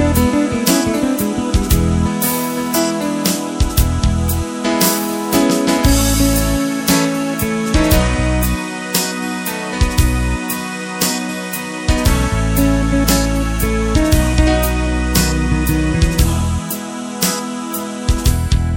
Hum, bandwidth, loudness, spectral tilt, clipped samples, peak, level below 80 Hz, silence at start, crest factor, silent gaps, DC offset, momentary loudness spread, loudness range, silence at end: none; 17 kHz; -16 LUFS; -4.5 dB/octave; under 0.1%; 0 dBFS; -20 dBFS; 0 s; 16 dB; none; under 0.1%; 7 LU; 3 LU; 0 s